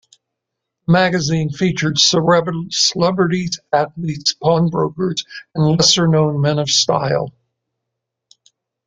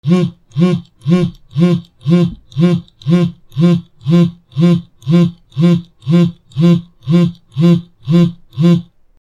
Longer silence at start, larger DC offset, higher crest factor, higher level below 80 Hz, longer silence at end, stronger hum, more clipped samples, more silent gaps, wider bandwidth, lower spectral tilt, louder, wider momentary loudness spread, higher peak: first, 0.9 s vs 0.05 s; neither; first, 18 dB vs 12 dB; about the same, -52 dBFS vs -48 dBFS; first, 1.55 s vs 0.4 s; neither; neither; neither; first, 9.4 kHz vs 7.4 kHz; second, -4 dB/octave vs -8.5 dB/octave; about the same, -16 LUFS vs -14 LUFS; first, 9 LU vs 5 LU; about the same, 0 dBFS vs 0 dBFS